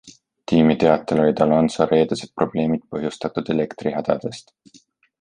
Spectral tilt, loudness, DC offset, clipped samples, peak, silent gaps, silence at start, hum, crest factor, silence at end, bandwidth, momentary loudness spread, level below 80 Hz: -7 dB/octave; -20 LUFS; under 0.1%; under 0.1%; -2 dBFS; none; 0.05 s; none; 18 dB; 0.8 s; 10 kHz; 10 LU; -52 dBFS